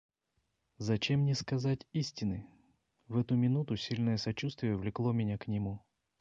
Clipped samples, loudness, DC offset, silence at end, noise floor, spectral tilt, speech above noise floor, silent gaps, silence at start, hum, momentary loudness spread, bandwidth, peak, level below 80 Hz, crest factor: under 0.1%; -34 LUFS; under 0.1%; 0.4 s; -81 dBFS; -6.5 dB/octave; 48 dB; none; 0.8 s; none; 8 LU; 7.6 kHz; -20 dBFS; -60 dBFS; 14 dB